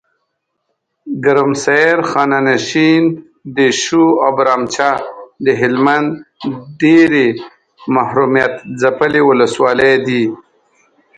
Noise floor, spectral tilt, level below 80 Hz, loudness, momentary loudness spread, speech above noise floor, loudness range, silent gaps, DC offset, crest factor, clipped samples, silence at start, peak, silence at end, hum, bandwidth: -70 dBFS; -5 dB/octave; -56 dBFS; -13 LUFS; 13 LU; 58 dB; 2 LU; none; under 0.1%; 14 dB; under 0.1%; 1.05 s; 0 dBFS; 0.8 s; none; 9.2 kHz